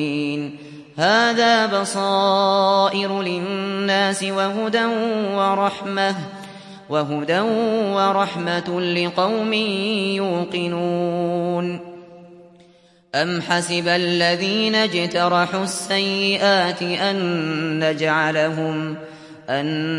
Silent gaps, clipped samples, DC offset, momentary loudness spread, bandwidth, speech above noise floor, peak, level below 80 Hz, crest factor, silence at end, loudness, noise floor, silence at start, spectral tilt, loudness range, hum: none; under 0.1%; under 0.1%; 9 LU; 11.5 kHz; 33 dB; -4 dBFS; -70 dBFS; 16 dB; 0 s; -20 LUFS; -53 dBFS; 0 s; -4.5 dB/octave; 5 LU; none